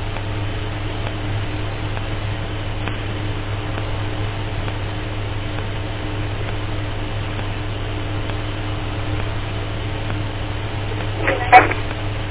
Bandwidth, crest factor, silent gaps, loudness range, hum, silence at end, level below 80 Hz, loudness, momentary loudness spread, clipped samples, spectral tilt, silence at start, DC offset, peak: 4 kHz; 22 dB; none; 7 LU; none; 0 s; -30 dBFS; -23 LUFS; 5 LU; under 0.1%; -10 dB/octave; 0 s; under 0.1%; 0 dBFS